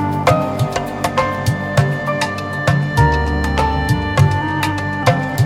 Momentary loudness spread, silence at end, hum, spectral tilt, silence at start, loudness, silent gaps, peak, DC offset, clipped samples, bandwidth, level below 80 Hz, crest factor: 5 LU; 0 s; none; -6 dB/octave; 0 s; -17 LUFS; none; 0 dBFS; under 0.1%; under 0.1%; 16 kHz; -28 dBFS; 16 dB